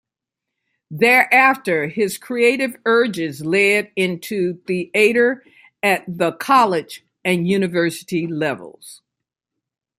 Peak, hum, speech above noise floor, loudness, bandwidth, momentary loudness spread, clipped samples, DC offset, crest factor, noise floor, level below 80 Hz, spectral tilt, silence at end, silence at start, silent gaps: 0 dBFS; none; 65 dB; -17 LUFS; 16 kHz; 11 LU; under 0.1%; under 0.1%; 18 dB; -83 dBFS; -66 dBFS; -5 dB/octave; 1.05 s; 0.9 s; none